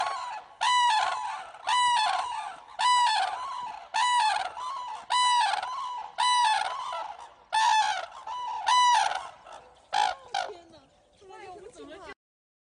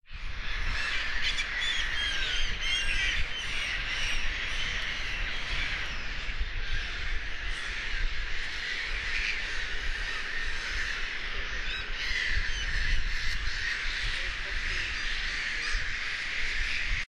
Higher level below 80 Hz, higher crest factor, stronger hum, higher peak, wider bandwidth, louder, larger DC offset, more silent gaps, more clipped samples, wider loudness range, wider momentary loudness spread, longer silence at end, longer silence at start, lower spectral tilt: second, -70 dBFS vs -34 dBFS; about the same, 16 dB vs 16 dB; neither; about the same, -12 dBFS vs -14 dBFS; about the same, 10 kHz vs 11 kHz; first, -27 LUFS vs -31 LUFS; neither; neither; neither; about the same, 3 LU vs 4 LU; first, 21 LU vs 6 LU; first, 0.5 s vs 0.1 s; about the same, 0 s vs 0.1 s; second, 1.5 dB/octave vs -1.5 dB/octave